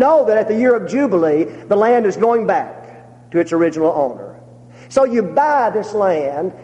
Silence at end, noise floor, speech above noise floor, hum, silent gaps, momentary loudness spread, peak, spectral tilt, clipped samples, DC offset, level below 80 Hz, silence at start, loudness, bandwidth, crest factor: 0 s; -40 dBFS; 25 dB; none; none; 7 LU; -2 dBFS; -6.5 dB/octave; under 0.1%; under 0.1%; -60 dBFS; 0 s; -16 LUFS; 9.6 kHz; 14 dB